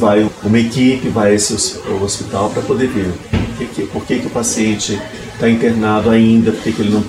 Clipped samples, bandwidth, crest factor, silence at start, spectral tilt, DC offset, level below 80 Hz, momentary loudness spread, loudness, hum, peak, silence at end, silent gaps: under 0.1%; 14 kHz; 14 dB; 0 s; -5 dB/octave; under 0.1%; -38 dBFS; 9 LU; -15 LUFS; none; -2 dBFS; 0 s; none